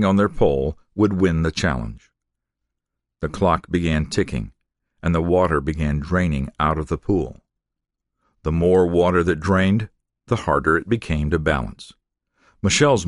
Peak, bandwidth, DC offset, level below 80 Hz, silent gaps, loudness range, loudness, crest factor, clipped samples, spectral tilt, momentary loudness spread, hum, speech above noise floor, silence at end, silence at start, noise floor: -2 dBFS; 11.5 kHz; under 0.1%; -34 dBFS; none; 4 LU; -21 LUFS; 18 dB; under 0.1%; -6 dB/octave; 11 LU; none; 63 dB; 0 s; 0 s; -82 dBFS